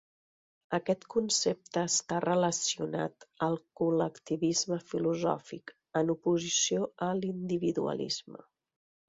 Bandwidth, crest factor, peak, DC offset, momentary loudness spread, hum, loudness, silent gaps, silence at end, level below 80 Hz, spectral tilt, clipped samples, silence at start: 8 kHz; 18 dB; -14 dBFS; under 0.1%; 8 LU; none; -31 LUFS; none; 0.7 s; -72 dBFS; -4 dB/octave; under 0.1%; 0.7 s